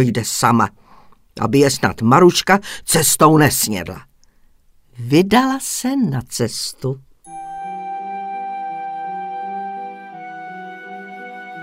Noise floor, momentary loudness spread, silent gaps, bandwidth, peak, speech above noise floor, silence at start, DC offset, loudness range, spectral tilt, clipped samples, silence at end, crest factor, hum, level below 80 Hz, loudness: -51 dBFS; 21 LU; none; 16.5 kHz; 0 dBFS; 36 dB; 0 s; under 0.1%; 13 LU; -4.5 dB/octave; under 0.1%; 0 s; 18 dB; none; -50 dBFS; -17 LUFS